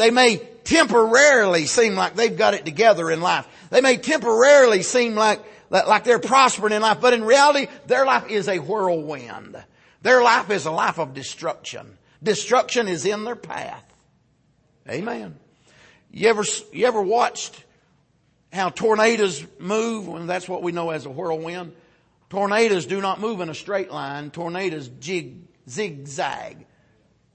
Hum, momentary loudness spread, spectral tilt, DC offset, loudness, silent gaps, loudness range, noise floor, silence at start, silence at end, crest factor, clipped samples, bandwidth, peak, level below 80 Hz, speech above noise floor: none; 17 LU; -3 dB/octave; under 0.1%; -20 LUFS; none; 11 LU; -63 dBFS; 0 s; 0.8 s; 18 dB; under 0.1%; 8.8 kHz; -2 dBFS; -62 dBFS; 43 dB